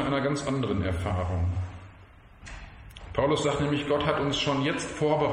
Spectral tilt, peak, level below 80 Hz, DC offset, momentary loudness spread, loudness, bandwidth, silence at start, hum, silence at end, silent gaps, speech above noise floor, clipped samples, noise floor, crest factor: -5.5 dB/octave; -10 dBFS; -44 dBFS; under 0.1%; 19 LU; -28 LUFS; 11 kHz; 0 s; none; 0 s; none; 25 dB; under 0.1%; -51 dBFS; 18 dB